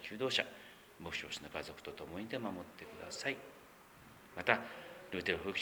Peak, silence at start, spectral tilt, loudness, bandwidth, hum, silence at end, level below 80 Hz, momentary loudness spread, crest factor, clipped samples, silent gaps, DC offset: -12 dBFS; 0 s; -3.5 dB/octave; -40 LUFS; over 20 kHz; none; 0 s; -68 dBFS; 21 LU; 30 dB; under 0.1%; none; under 0.1%